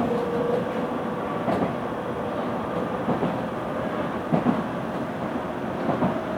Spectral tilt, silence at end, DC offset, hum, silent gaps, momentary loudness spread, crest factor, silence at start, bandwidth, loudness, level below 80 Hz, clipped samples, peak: -7.5 dB/octave; 0 s; under 0.1%; none; none; 5 LU; 18 dB; 0 s; 18 kHz; -27 LUFS; -52 dBFS; under 0.1%; -8 dBFS